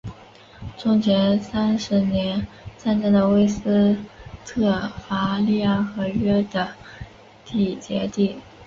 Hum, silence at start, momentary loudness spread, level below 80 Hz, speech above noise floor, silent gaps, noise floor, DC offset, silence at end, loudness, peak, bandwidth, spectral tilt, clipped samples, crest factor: none; 0.05 s; 20 LU; -46 dBFS; 26 dB; none; -46 dBFS; under 0.1%; 0 s; -22 LUFS; -8 dBFS; 7.4 kHz; -7 dB/octave; under 0.1%; 14 dB